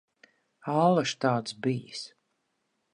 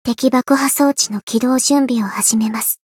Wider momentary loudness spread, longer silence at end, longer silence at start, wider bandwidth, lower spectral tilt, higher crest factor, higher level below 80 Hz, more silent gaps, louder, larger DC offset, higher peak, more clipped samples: first, 17 LU vs 4 LU; first, 0.85 s vs 0.15 s; first, 0.65 s vs 0.05 s; second, 11 kHz vs 18 kHz; first, -5.5 dB/octave vs -3 dB/octave; first, 20 dB vs 14 dB; second, -78 dBFS vs -60 dBFS; second, none vs 1.23-1.27 s; second, -27 LUFS vs -15 LUFS; neither; second, -10 dBFS vs -2 dBFS; neither